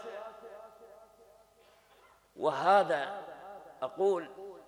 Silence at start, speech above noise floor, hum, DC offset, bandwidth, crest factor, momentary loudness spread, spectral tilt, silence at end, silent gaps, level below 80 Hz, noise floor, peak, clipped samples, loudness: 0 s; 34 dB; 50 Hz at -75 dBFS; under 0.1%; 13.5 kHz; 22 dB; 24 LU; -5 dB/octave; 0.05 s; none; -78 dBFS; -63 dBFS; -12 dBFS; under 0.1%; -31 LUFS